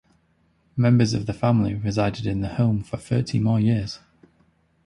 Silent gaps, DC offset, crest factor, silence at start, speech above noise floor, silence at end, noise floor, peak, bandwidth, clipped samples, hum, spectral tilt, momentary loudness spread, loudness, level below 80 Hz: none; under 0.1%; 16 dB; 0.75 s; 43 dB; 0.9 s; -64 dBFS; -6 dBFS; 11 kHz; under 0.1%; none; -7.5 dB/octave; 8 LU; -23 LUFS; -46 dBFS